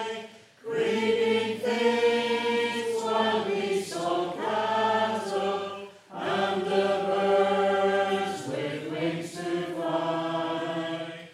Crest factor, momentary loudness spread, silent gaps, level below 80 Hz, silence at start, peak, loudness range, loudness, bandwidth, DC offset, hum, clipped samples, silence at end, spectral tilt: 16 dB; 10 LU; none; -82 dBFS; 0 s; -12 dBFS; 2 LU; -27 LUFS; 14.5 kHz; under 0.1%; none; under 0.1%; 0 s; -4.5 dB/octave